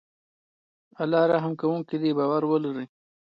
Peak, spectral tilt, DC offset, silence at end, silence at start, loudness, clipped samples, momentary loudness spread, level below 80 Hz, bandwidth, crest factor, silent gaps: -10 dBFS; -9.5 dB/octave; under 0.1%; 0.4 s; 1 s; -25 LUFS; under 0.1%; 11 LU; -76 dBFS; 5.6 kHz; 18 dB; none